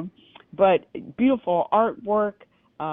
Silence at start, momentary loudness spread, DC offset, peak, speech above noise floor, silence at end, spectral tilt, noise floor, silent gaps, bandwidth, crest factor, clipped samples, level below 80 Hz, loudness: 0 s; 17 LU; under 0.1%; -6 dBFS; 21 dB; 0 s; -10 dB/octave; -43 dBFS; none; 3.9 kHz; 18 dB; under 0.1%; -62 dBFS; -22 LUFS